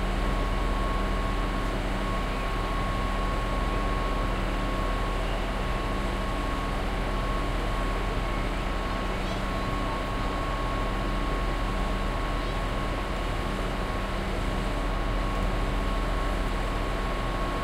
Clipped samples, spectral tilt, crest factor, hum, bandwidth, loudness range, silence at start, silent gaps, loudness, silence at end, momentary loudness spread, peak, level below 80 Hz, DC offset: under 0.1%; -5.5 dB/octave; 12 dB; none; 13 kHz; 1 LU; 0 s; none; -30 LUFS; 0 s; 1 LU; -16 dBFS; -30 dBFS; under 0.1%